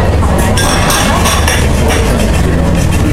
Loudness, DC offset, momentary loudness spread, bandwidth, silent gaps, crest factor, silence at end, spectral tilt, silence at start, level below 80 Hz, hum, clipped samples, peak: -10 LUFS; under 0.1%; 2 LU; 16 kHz; none; 10 dB; 0 s; -4.5 dB/octave; 0 s; -14 dBFS; none; 0.2%; 0 dBFS